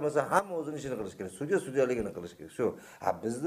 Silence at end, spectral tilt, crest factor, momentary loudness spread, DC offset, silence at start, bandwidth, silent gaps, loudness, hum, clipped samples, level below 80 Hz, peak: 0 s; -5.5 dB/octave; 22 dB; 11 LU; under 0.1%; 0 s; 15.5 kHz; none; -32 LUFS; none; under 0.1%; -62 dBFS; -10 dBFS